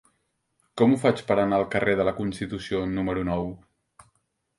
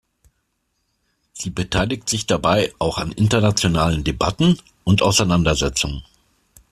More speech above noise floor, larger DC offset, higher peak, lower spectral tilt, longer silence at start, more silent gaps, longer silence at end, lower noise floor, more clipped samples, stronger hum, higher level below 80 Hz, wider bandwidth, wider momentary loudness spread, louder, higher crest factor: about the same, 49 dB vs 52 dB; neither; second, -6 dBFS vs -2 dBFS; first, -7 dB/octave vs -4.5 dB/octave; second, 0.75 s vs 1.35 s; neither; first, 1 s vs 0.7 s; about the same, -73 dBFS vs -71 dBFS; neither; neither; second, -50 dBFS vs -36 dBFS; second, 11.5 kHz vs 14 kHz; about the same, 9 LU vs 8 LU; second, -25 LUFS vs -19 LUFS; about the same, 20 dB vs 18 dB